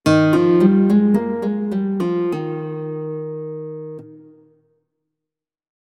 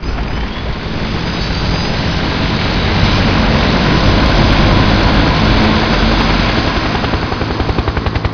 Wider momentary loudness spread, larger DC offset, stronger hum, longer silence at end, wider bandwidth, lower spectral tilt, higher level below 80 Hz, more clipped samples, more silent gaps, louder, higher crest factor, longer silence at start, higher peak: first, 17 LU vs 8 LU; neither; neither; first, 1.75 s vs 0 s; first, 12.5 kHz vs 5.4 kHz; first, -8 dB/octave vs -6 dB/octave; second, -60 dBFS vs -18 dBFS; neither; neither; second, -18 LUFS vs -13 LUFS; first, 18 dB vs 12 dB; about the same, 0.05 s vs 0 s; about the same, -2 dBFS vs 0 dBFS